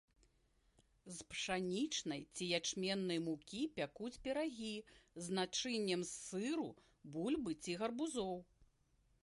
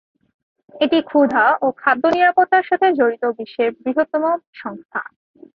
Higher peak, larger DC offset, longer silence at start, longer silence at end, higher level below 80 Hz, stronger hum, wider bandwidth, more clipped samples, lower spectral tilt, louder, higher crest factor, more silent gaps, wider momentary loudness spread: second, -24 dBFS vs -2 dBFS; neither; first, 1.05 s vs 0.75 s; about the same, 0.6 s vs 0.55 s; second, -72 dBFS vs -64 dBFS; neither; first, 11.5 kHz vs 6.4 kHz; neither; second, -3.5 dB/octave vs -6 dB/octave; second, -42 LUFS vs -17 LUFS; about the same, 20 dB vs 16 dB; second, none vs 4.47-4.53 s, 4.85-4.89 s; second, 11 LU vs 14 LU